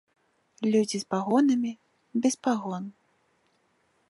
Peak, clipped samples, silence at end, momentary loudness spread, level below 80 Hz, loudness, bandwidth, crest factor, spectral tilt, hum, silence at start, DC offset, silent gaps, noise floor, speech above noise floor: -10 dBFS; under 0.1%; 1.2 s; 13 LU; -80 dBFS; -27 LUFS; 11.5 kHz; 18 dB; -5 dB/octave; none; 0.6 s; under 0.1%; none; -70 dBFS; 44 dB